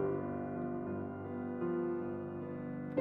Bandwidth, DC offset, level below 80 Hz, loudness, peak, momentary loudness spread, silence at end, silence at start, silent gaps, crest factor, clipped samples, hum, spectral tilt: 3.4 kHz; under 0.1%; -68 dBFS; -40 LUFS; -20 dBFS; 6 LU; 0 s; 0 s; none; 18 dB; under 0.1%; none; -9.5 dB/octave